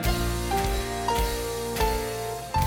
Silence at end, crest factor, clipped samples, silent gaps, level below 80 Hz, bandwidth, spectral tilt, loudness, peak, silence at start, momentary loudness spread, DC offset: 0 s; 14 dB; under 0.1%; none; -32 dBFS; 17.5 kHz; -4.5 dB/octave; -27 LUFS; -12 dBFS; 0 s; 3 LU; under 0.1%